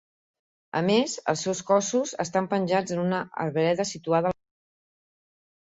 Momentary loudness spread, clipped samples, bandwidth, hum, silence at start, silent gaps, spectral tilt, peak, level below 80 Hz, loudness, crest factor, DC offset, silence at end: 6 LU; under 0.1%; 8 kHz; none; 0.75 s; none; -4.5 dB/octave; -8 dBFS; -66 dBFS; -26 LUFS; 18 dB; under 0.1%; 1.45 s